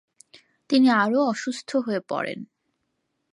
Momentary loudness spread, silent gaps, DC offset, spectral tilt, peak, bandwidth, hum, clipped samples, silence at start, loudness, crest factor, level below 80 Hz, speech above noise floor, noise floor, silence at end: 11 LU; none; under 0.1%; -5 dB/octave; -8 dBFS; 11 kHz; none; under 0.1%; 0.7 s; -23 LUFS; 16 dB; -76 dBFS; 54 dB; -76 dBFS; 0.85 s